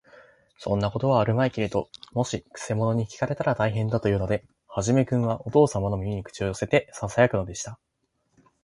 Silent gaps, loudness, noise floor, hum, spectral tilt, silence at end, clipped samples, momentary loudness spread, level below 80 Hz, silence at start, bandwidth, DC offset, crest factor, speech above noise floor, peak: none; -25 LUFS; -71 dBFS; none; -6.5 dB/octave; 0.9 s; under 0.1%; 10 LU; -48 dBFS; 0.6 s; 11.5 kHz; under 0.1%; 20 dB; 47 dB; -6 dBFS